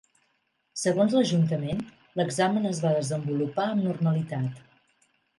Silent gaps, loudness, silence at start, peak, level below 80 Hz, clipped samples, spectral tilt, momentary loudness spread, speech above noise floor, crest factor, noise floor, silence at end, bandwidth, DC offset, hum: none; -27 LUFS; 0.75 s; -10 dBFS; -62 dBFS; under 0.1%; -6 dB/octave; 10 LU; 48 dB; 16 dB; -73 dBFS; 0.8 s; 11.5 kHz; under 0.1%; none